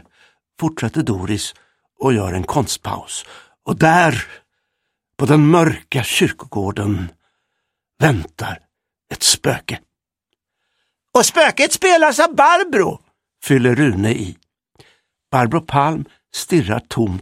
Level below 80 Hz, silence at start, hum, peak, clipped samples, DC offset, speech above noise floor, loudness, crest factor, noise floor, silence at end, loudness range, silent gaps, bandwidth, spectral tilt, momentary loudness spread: -46 dBFS; 0.6 s; none; 0 dBFS; under 0.1%; under 0.1%; 61 dB; -16 LUFS; 18 dB; -77 dBFS; 0 s; 6 LU; none; 16 kHz; -4.5 dB/octave; 16 LU